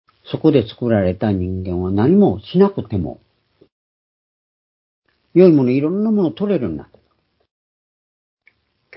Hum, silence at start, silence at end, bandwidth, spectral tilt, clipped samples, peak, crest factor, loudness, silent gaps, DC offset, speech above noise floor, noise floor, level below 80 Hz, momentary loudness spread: none; 0.25 s; 2.15 s; 5.8 kHz; -13 dB/octave; under 0.1%; 0 dBFS; 18 dB; -17 LUFS; 3.72-5.02 s; under 0.1%; 49 dB; -64 dBFS; -42 dBFS; 12 LU